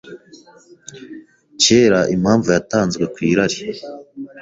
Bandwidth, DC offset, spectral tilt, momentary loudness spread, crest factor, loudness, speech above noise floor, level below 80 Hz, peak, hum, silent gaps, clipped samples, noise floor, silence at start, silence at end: 8 kHz; under 0.1%; -4 dB/octave; 23 LU; 18 dB; -16 LUFS; 30 dB; -50 dBFS; 0 dBFS; none; none; under 0.1%; -47 dBFS; 0.05 s; 0 s